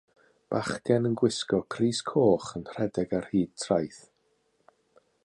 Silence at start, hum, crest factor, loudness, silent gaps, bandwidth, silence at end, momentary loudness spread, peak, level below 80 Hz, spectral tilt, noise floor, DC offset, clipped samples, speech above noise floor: 0.5 s; none; 20 dB; -28 LUFS; none; 11 kHz; 1.25 s; 8 LU; -10 dBFS; -60 dBFS; -5.5 dB/octave; -72 dBFS; under 0.1%; under 0.1%; 44 dB